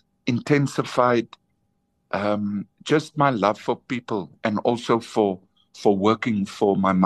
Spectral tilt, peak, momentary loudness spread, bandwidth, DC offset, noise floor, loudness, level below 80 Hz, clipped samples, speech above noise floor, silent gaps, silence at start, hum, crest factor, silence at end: -6.5 dB/octave; -4 dBFS; 8 LU; 12.5 kHz; under 0.1%; -70 dBFS; -23 LUFS; -66 dBFS; under 0.1%; 49 dB; none; 0.25 s; none; 20 dB; 0 s